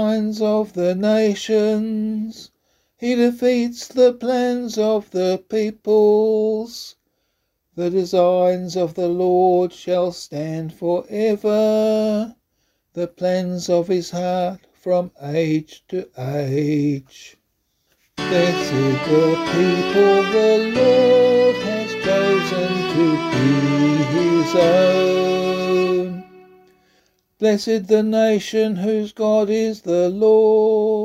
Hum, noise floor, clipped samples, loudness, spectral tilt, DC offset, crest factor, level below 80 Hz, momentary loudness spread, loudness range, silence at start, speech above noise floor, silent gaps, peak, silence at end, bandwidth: none; -71 dBFS; under 0.1%; -18 LUFS; -6 dB/octave; under 0.1%; 16 dB; -58 dBFS; 11 LU; 6 LU; 0 s; 54 dB; none; -4 dBFS; 0 s; 14.5 kHz